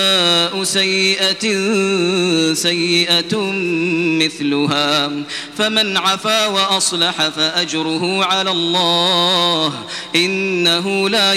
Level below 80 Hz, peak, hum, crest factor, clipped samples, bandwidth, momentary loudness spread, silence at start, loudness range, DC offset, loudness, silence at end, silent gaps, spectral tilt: -58 dBFS; 0 dBFS; none; 16 dB; under 0.1%; 16 kHz; 6 LU; 0 s; 1 LU; under 0.1%; -15 LUFS; 0 s; none; -3 dB/octave